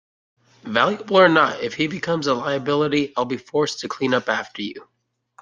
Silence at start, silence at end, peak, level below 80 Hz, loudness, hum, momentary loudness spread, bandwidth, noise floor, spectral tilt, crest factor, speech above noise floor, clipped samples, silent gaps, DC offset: 0.65 s; 0.6 s; -2 dBFS; -64 dBFS; -20 LUFS; none; 10 LU; 9.4 kHz; -55 dBFS; -5 dB/octave; 20 dB; 34 dB; under 0.1%; none; under 0.1%